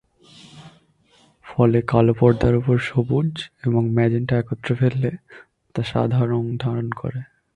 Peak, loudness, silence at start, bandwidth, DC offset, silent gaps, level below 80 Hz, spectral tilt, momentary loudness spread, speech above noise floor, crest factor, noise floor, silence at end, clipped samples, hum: -2 dBFS; -21 LUFS; 0.55 s; 9 kHz; under 0.1%; none; -44 dBFS; -9 dB/octave; 12 LU; 38 dB; 20 dB; -57 dBFS; 0.3 s; under 0.1%; none